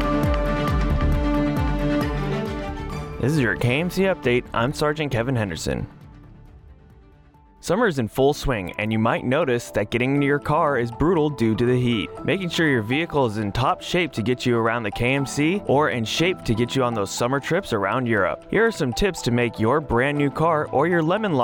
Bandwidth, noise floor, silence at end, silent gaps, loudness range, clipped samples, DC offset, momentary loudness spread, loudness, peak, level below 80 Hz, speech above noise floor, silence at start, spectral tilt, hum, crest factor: 19 kHz; -51 dBFS; 0 s; none; 4 LU; under 0.1%; under 0.1%; 5 LU; -22 LUFS; -8 dBFS; -34 dBFS; 30 dB; 0 s; -6 dB/octave; none; 14 dB